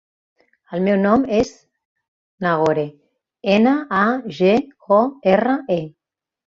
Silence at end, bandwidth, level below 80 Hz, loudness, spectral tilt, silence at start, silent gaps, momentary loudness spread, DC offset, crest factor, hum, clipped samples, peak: 0.6 s; 7.6 kHz; -54 dBFS; -18 LUFS; -7 dB/octave; 0.7 s; 1.85-1.96 s, 2.08-2.38 s; 9 LU; under 0.1%; 16 dB; none; under 0.1%; -2 dBFS